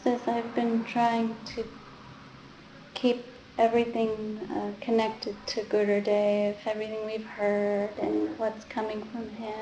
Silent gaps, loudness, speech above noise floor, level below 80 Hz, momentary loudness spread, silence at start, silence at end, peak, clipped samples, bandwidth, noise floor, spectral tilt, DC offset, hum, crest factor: none; -29 LUFS; 21 dB; -64 dBFS; 16 LU; 0 s; 0 s; -10 dBFS; under 0.1%; 8.8 kHz; -49 dBFS; -6 dB/octave; under 0.1%; none; 18 dB